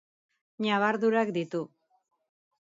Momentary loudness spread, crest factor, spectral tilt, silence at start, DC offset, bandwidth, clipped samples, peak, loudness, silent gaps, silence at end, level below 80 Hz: 11 LU; 18 dB; -6 dB/octave; 0.6 s; under 0.1%; 7.8 kHz; under 0.1%; -12 dBFS; -28 LUFS; none; 1.15 s; -80 dBFS